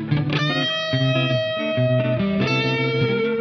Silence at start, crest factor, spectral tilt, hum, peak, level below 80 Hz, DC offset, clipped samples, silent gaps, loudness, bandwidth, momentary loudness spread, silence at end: 0 s; 14 dB; -6.5 dB/octave; none; -8 dBFS; -52 dBFS; under 0.1%; under 0.1%; none; -20 LUFS; 6.4 kHz; 2 LU; 0 s